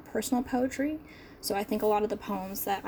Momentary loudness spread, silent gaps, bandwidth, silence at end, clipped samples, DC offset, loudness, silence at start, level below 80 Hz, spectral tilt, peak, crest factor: 9 LU; none; over 20 kHz; 0 s; under 0.1%; under 0.1%; -31 LUFS; 0 s; -56 dBFS; -4.5 dB/octave; -16 dBFS; 16 dB